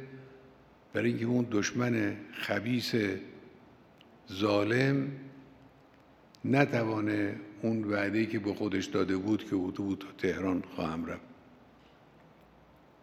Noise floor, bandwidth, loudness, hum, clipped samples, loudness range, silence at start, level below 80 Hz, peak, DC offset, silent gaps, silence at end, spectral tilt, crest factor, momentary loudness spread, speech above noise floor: -59 dBFS; 15 kHz; -32 LUFS; none; under 0.1%; 3 LU; 0 s; -70 dBFS; -8 dBFS; under 0.1%; none; 1.7 s; -6 dB/octave; 26 dB; 12 LU; 28 dB